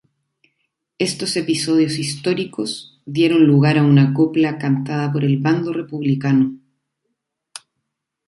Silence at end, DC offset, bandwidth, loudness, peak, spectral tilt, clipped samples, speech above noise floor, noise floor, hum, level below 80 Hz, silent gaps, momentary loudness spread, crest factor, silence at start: 1.7 s; under 0.1%; 11.5 kHz; -18 LUFS; -2 dBFS; -6 dB/octave; under 0.1%; 61 dB; -78 dBFS; none; -62 dBFS; none; 13 LU; 16 dB; 1 s